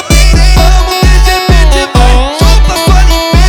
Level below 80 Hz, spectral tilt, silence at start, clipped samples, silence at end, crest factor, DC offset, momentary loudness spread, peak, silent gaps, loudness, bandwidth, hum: -6 dBFS; -4.5 dB/octave; 0 s; 6%; 0 s; 4 dB; under 0.1%; 2 LU; 0 dBFS; none; -7 LUFS; 15.5 kHz; none